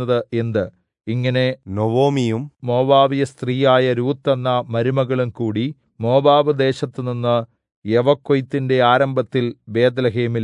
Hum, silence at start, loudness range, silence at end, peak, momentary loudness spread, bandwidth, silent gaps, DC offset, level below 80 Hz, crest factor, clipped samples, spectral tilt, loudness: none; 0 s; 1 LU; 0 s; -2 dBFS; 10 LU; 10.5 kHz; 7.76-7.82 s; under 0.1%; -64 dBFS; 16 dB; under 0.1%; -7.5 dB/octave; -18 LUFS